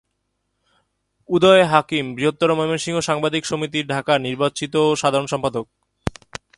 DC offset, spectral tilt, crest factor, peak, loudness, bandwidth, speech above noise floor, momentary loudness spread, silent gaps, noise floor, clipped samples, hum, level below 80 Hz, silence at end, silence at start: under 0.1%; -4.5 dB/octave; 20 dB; 0 dBFS; -19 LUFS; 11.5 kHz; 54 dB; 16 LU; none; -73 dBFS; under 0.1%; none; -50 dBFS; 0.5 s; 1.3 s